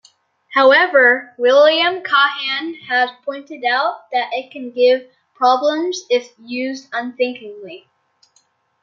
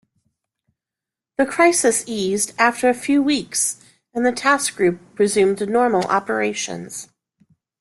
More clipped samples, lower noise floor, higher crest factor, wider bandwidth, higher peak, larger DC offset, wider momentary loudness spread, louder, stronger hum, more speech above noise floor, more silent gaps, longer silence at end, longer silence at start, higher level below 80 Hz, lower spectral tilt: neither; second, -61 dBFS vs -87 dBFS; about the same, 16 dB vs 18 dB; second, 7.2 kHz vs 12.5 kHz; about the same, 0 dBFS vs -2 dBFS; neither; first, 16 LU vs 11 LU; first, -16 LUFS vs -19 LUFS; neither; second, 44 dB vs 69 dB; neither; first, 1.05 s vs 0.75 s; second, 0.5 s vs 1.4 s; second, -74 dBFS vs -62 dBFS; about the same, -2 dB/octave vs -3 dB/octave